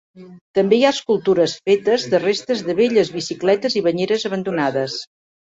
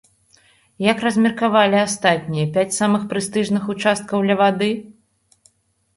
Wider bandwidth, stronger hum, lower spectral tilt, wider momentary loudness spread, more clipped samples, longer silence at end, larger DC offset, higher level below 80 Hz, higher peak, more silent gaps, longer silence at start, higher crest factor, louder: second, 8 kHz vs 11.5 kHz; neither; about the same, -5 dB/octave vs -4.5 dB/octave; about the same, 6 LU vs 6 LU; neither; second, 0.55 s vs 1.05 s; neither; about the same, -62 dBFS vs -60 dBFS; about the same, -2 dBFS vs -2 dBFS; first, 0.41-0.54 s vs none; second, 0.15 s vs 0.8 s; about the same, 16 dB vs 18 dB; about the same, -18 LUFS vs -18 LUFS